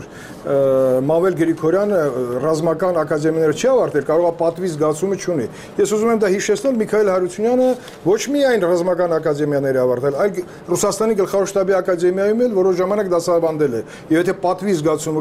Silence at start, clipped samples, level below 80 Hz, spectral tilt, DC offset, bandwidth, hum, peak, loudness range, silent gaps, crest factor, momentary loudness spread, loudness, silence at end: 0 s; under 0.1%; -54 dBFS; -5.5 dB/octave; under 0.1%; 15.5 kHz; none; -6 dBFS; 1 LU; none; 12 dB; 5 LU; -18 LUFS; 0 s